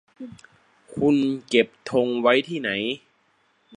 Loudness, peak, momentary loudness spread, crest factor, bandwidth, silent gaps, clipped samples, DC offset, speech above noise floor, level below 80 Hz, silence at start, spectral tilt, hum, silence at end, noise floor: -22 LUFS; -2 dBFS; 19 LU; 22 dB; 10.5 kHz; none; under 0.1%; under 0.1%; 42 dB; -62 dBFS; 0.2 s; -5.5 dB/octave; none; 0.8 s; -65 dBFS